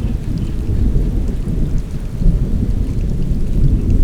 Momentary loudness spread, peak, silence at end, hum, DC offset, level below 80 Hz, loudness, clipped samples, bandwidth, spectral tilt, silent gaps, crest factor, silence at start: 5 LU; -2 dBFS; 0 s; none; under 0.1%; -16 dBFS; -20 LUFS; under 0.1%; 8.6 kHz; -9 dB/octave; none; 12 dB; 0 s